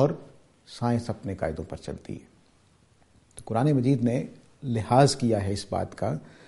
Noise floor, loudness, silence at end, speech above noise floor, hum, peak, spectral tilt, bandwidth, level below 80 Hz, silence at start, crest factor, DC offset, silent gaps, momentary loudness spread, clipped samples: -61 dBFS; -27 LUFS; 0.2 s; 35 dB; none; -4 dBFS; -6.5 dB/octave; 11.5 kHz; -54 dBFS; 0 s; 22 dB; under 0.1%; none; 18 LU; under 0.1%